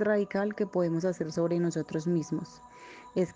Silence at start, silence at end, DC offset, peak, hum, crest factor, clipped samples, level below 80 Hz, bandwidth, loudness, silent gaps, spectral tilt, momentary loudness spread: 0 s; 0.05 s; under 0.1%; -16 dBFS; none; 14 dB; under 0.1%; -68 dBFS; 9.6 kHz; -31 LUFS; none; -7 dB/octave; 18 LU